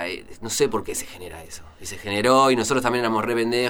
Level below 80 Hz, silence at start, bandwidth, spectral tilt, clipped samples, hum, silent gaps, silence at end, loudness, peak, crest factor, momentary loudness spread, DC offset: -48 dBFS; 0 s; 19.5 kHz; -3.5 dB/octave; under 0.1%; none; none; 0 s; -21 LUFS; -4 dBFS; 20 dB; 20 LU; under 0.1%